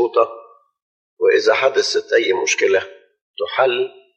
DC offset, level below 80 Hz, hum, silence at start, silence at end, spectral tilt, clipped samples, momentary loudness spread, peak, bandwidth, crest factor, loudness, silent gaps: under 0.1%; -74 dBFS; none; 0 s; 0.25 s; -1.5 dB/octave; under 0.1%; 8 LU; -2 dBFS; 8.6 kHz; 16 dB; -17 LUFS; 0.82-1.17 s, 3.21-3.34 s